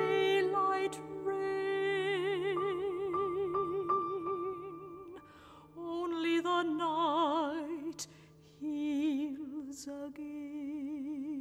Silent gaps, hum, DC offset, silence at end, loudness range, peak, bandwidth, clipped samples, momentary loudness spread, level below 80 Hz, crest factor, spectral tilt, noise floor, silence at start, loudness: none; none; under 0.1%; 0 s; 5 LU; -20 dBFS; 13.5 kHz; under 0.1%; 13 LU; -72 dBFS; 16 dB; -4.5 dB/octave; -58 dBFS; 0 s; -35 LUFS